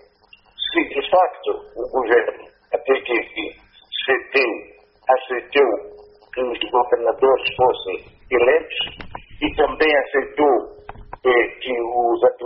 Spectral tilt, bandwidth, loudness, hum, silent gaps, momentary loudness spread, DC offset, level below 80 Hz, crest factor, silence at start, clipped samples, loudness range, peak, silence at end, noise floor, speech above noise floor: -1 dB/octave; 5.8 kHz; -20 LUFS; none; none; 11 LU; under 0.1%; -48 dBFS; 16 dB; 0.6 s; under 0.1%; 2 LU; -4 dBFS; 0 s; -52 dBFS; 33 dB